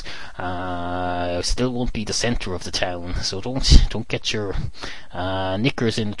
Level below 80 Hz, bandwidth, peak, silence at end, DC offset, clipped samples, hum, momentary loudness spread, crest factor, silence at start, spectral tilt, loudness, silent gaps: -24 dBFS; 11.5 kHz; 0 dBFS; 0 s; 3%; under 0.1%; none; 12 LU; 22 dB; 0 s; -4.5 dB/octave; -23 LUFS; none